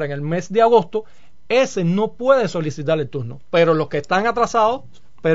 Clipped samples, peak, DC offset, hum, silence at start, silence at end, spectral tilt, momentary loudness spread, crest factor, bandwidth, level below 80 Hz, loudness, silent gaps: under 0.1%; -2 dBFS; 2%; none; 0 s; 0 s; -6 dB/octave; 10 LU; 16 dB; 7.8 kHz; -54 dBFS; -19 LUFS; none